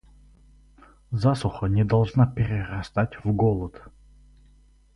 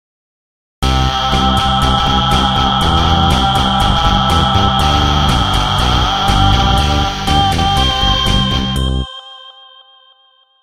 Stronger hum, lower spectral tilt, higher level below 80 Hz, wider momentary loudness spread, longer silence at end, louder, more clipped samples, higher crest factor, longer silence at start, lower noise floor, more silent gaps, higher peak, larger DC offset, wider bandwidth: neither; first, -8.5 dB/octave vs -4.5 dB/octave; second, -44 dBFS vs -20 dBFS; first, 8 LU vs 4 LU; about the same, 1.05 s vs 1.1 s; second, -24 LUFS vs -12 LUFS; neither; about the same, 18 dB vs 14 dB; first, 1.1 s vs 0.8 s; first, -56 dBFS vs -52 dBFS; neither; second, -8 dBFS vs 0 dBFS; neither; second, 11 kHz vs 15.5 kHz